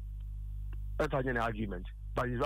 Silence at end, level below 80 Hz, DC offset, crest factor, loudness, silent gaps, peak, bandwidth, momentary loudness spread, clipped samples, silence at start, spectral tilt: 0 s; -42 dBFS; under 0.1%; 16 dB; -37 LUFS; none; -20 dBFS; 13 kHz; 12 LU; under 0.1%; 0 s; -7 dB/octave